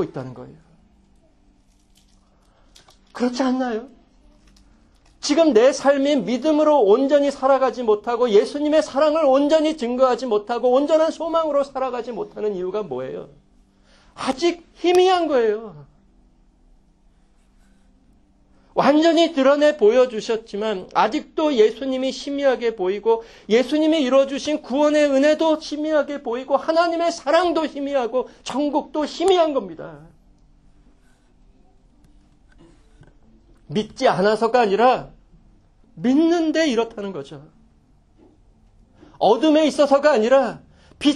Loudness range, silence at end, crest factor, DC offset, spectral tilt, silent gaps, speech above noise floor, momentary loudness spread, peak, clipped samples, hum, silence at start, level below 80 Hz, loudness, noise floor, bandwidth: 9 LU; 0 s; 18 dB; under 0.1%; -4.5 dB/octave; none; 38 dB; 11 LU; -4 dBFS; under 0.1%; none; 0 s; -56 dBFS; -19 LUFS; -56 dBFS; 11 kHz